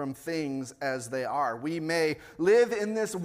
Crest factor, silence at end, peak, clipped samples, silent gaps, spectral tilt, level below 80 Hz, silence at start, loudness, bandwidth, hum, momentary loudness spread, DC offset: 16 dB; 0 s; -12 dBFS; under 0.1%; none; -5 dB/octave; -68 dBFS; 0 s; -29 LUFS; 16 kHz; none; 10 LU; under 0.1%